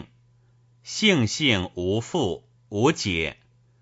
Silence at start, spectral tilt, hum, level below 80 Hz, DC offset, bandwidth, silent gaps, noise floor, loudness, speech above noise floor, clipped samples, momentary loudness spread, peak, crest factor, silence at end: 0 s; -4.5 dB/octave; none; -52 dBFS; under 0.1%; 8 kHz; none; -59 dBFS; -24 LUFS; 36 dB; under 0.1%; 12 LU; -6 dBFS; 20 dB; 0.5 s